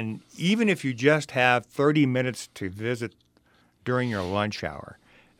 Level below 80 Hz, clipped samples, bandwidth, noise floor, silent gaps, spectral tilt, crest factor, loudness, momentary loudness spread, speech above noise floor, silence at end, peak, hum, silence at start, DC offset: -62 dBFS; under 0.1%; 16 kHz; -63 dBFS; none; -5.5 dB/octave; 22 dB; -25 LUFS; 14 LU; 37 dB; 0.45 s; -4 dBFS; none; 0 s; under 0.1%